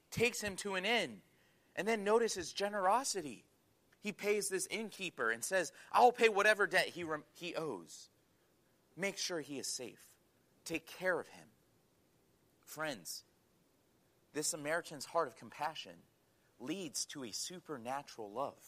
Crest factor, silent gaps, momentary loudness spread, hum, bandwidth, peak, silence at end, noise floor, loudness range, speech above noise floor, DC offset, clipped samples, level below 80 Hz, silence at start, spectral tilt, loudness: 24 dB; none; 16 LU; none; 15 kHz; -16 dBFS; 0 s; -73 dBFS; 11 LU; 36 dB; under 0.1%; under 0.1%; -76 dBFS; 0.1 s; -2.5 dB/octave; -37 LUFS